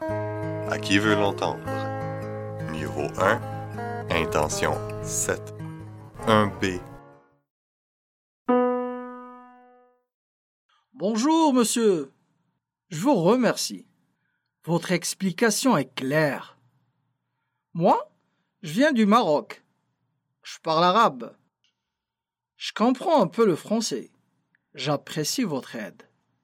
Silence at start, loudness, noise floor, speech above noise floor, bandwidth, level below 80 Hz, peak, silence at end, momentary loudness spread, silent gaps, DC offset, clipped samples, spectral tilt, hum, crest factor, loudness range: 0 s; -24 LUFS; -88 dBFS; 65 dB; 16.5 kHz; -54 dBFS; -2 dBFS; 0.55 s; 18 LU; 7.50-8.45 s, 10.14-10.69 s; under 0.1%; under 0.1%; -4.5 dB/octave; none; 24 dB; 5 LU